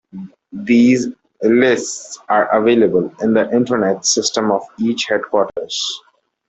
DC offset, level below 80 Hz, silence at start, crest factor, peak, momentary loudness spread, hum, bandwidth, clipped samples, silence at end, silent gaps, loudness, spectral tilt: under 0.1%; -58 dBFS; 0.15 s; 14 dB; -2 dBFS; 14 LU; none; 8.4 kHz; under 0.1%; 0.5 s; none; -16 LUFS; -3.5 dB/octave